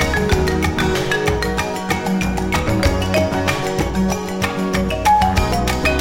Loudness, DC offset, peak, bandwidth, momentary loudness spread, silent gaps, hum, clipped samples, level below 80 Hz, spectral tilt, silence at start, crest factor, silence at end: -18 LUFS; under 0.1%; -2 dBFS; 17 kHz; 5 LU; none; none; under 0.1%; -26 dBFS; -5 dB/octave; 0 s; 16 dB; 0 s